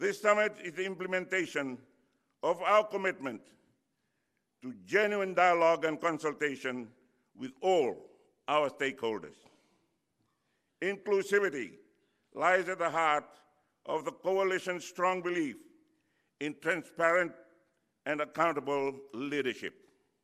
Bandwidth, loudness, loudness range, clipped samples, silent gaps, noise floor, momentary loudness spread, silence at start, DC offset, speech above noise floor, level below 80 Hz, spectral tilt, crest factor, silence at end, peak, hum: 14.5 kHz; -32 LUFS; 4 LU; under 0.1%; none; -81 dBFS; 16 LU; 0 s; under 0.1%; 49 dB; -84 dBFS; -4.5 dB/octave; 22 dB; 0.55 s; -10 dBFS; none